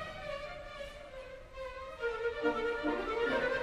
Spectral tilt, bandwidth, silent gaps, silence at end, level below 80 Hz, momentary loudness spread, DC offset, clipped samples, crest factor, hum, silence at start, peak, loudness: -5 dB/octave; 13 kHz; none; 0 s; -54 dBFS; 15 LU; under 0.1%; under 0.1%; 18 dB; none; 0 s; -20 dBFS; -37 LUFS